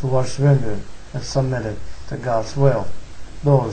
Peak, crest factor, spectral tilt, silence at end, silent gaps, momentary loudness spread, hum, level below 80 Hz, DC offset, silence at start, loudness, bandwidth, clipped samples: -2 dBFS; 16 dB; -7 dB/octave; 0 s; none; 17 LU; none; -38 dBFS; under 0.1%; 0 s; -21 LUFS; 9 kHz; under 0.1%